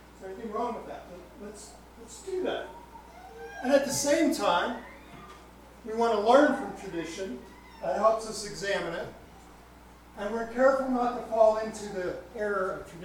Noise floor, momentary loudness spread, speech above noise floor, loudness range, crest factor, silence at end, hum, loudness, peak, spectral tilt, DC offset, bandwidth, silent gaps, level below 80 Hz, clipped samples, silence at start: -52 dBFS; 23 LU; 23 dB; 6 LU; 22 dB; 0 s; 60 Hz at -55 dBFS; -28 LUFS; -8 dBFS; -3.5 dB/octave; under 0.1%; 19 kHz; none; -56 dBFS; under 0.1%; 0 s